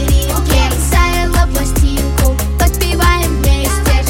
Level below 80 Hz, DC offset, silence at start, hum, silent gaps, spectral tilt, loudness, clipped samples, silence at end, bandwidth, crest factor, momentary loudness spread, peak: -14 dBFS; under 0.1%; 0 s; none; none; -4.5 dB/octave; -13 LUFS; under 0.1%; 0 s; 17 kHz; 12 dB; 2 LU; 0 dBFS